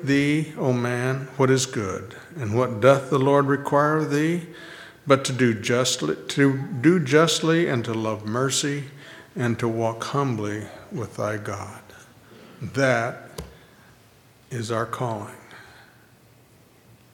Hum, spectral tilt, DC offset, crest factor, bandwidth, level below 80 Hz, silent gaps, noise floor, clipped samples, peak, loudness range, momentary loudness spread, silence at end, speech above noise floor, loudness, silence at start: none; -5 dB/octave; under 0.1%; 22 dB; 17 kHz; -60 dBFS; none; -54 dBFS; under 0.1%; -2 dBFS; 8 LU; 18 LU; 1.5 s; 32 dB; -23 LUFS; 0 s